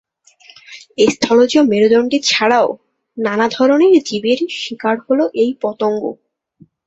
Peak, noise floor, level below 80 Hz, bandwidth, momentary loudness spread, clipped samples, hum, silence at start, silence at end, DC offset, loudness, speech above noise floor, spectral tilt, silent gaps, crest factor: 0 dBFS; -50 dBFS; -58 dBFS; 8.2 kHz; 11 LU; under 0.1%; none; 0.7 s; 0.75 s; under 0.1%; -14 LUFS; 36 dB; -4 dB/octave; none; 16 dB